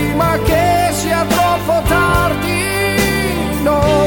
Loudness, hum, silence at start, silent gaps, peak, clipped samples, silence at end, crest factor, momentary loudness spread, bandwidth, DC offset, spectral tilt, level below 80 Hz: -14 LUFS; none; 0 s; none; -2 dBFS; under 0.1%; 0 s; 12 dB; 3 LU; 19 kHz; under 0.1%; -5 dB/octave; -26 dBFS